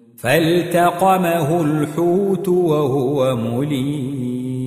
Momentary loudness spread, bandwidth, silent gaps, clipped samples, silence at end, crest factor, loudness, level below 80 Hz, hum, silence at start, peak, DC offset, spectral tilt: 7 LU; 16 kHz; none; under 0.1%; 0 s; 16 dB; -18 LUFS; -54 dBFS; none; 0.2 s; -2 dBFS; under 0.1%; -6.5 dB/octave